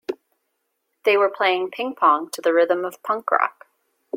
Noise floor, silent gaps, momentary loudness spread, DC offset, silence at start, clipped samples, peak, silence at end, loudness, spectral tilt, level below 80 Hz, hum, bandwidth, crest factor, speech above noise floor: -75 dBFS; none; 8 LU; under 0.1%; 0.1 s; under 0.1%; -2 dBFS; 0 s; -21 LUFS; -3 dB/octave; -78 dBFS; none; 16.5 kHz; 20 dB; 54 dB